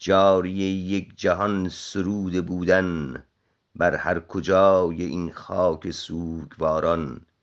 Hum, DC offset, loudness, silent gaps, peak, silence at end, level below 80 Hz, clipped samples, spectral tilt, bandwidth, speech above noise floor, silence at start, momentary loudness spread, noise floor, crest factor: none; under 0.1%; -24 LUFS; none; -4 dBFS; 0.25 s; -54 dBFS; under 0.1%; -6 dB/octave; 8 kHz; 29 dB; 0 s; 13 LU; -52 dBFS; 18 dB